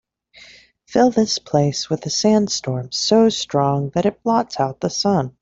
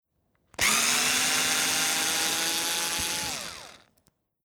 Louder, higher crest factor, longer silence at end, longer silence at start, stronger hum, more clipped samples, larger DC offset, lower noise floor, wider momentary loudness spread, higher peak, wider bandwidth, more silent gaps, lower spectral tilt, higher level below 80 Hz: first, -19 LUFS vs -24 LUFS; about the same, 16 dB vs 20 dB; second, 0.1 s vs 0.7 s; second, 0.4 s vs 0.6 s; neither; neither; neither; second, -47 dBFS vs -72 dBFS; second, 7 LU vs 12 LU; first, -2 dBFS vs -10 dBFS; second, 7.8 kHz vs over 20 kHz; neither; first, -5 dB/octave vs 0.5 dB/octave; about the same, -56 dBFS vs -58 dBFS